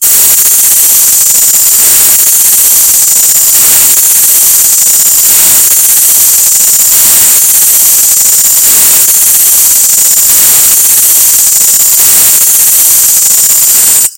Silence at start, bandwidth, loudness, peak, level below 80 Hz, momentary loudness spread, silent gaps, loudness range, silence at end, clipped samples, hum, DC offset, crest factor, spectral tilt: 0 s; over 20 kHz; -1 LUFS; 0 dBFS; -42 dBFS; 1 LU; none; 0 LU; 0.05 s; 10%; none; under 0.1%; 4 dB; 2 dB/octave